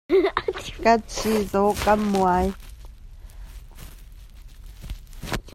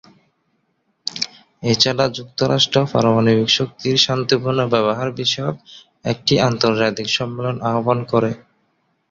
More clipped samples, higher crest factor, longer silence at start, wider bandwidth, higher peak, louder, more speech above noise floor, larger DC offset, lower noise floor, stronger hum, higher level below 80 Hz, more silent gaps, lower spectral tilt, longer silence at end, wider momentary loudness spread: neither; about the same, 18 dB vs 18 dB; second, 0.1 s vs 1.05 s; first, 16 kHz vs 7.8 kHz; second, -6 dBFS vs -2 dBFS; second, -22 LUFS vs -18 LUFS; second, 21 dB vs 49 dB; neither; second, -43 dBFS vs -67 dBFS; neither; first, -38 dBFS vs -54 dBFS; neither; about the same, -5 dB/octave vs -5 dB/octave; second, 0.05 s vs 0.7 s; first, 24 LU vs 11 LU